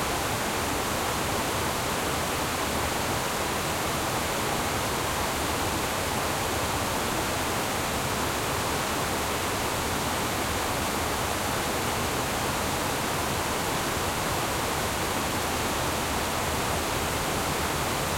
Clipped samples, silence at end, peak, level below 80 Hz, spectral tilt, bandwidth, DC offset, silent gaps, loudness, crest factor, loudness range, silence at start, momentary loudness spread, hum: under 0.1%; 0 s; -14 dBFS; -44 dBFS; -3 dB/octave; 16.5 kHz; under 0.1%; none; -27 LUFS; 14 dB; 0 LU; 0 s; 0 LU; none